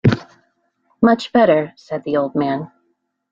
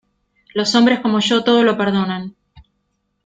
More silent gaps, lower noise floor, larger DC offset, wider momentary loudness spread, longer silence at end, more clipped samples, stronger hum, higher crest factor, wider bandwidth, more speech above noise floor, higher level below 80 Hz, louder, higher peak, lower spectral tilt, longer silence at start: neither; about the same, -68 dBFS vs -69 dBFS; neither; about the same, 13 LU vs 12 LU; about the same, 0.65 s vs 0.65 s; neither; neither; about the same, 16 dB vs 16 dB; second, 7.6 kHz vs 9.2 kHz; about the same, 51 dB vs 54 dB; first, -50 dBFS vs -56 dBFS; about the same, -18 LUFS vs -16 LUFS; about the same, -2 dBFS vs -2 dBFS; first, -8 dB/octave vs -5 dB/octave; second, 0.05 s vs 0.55 s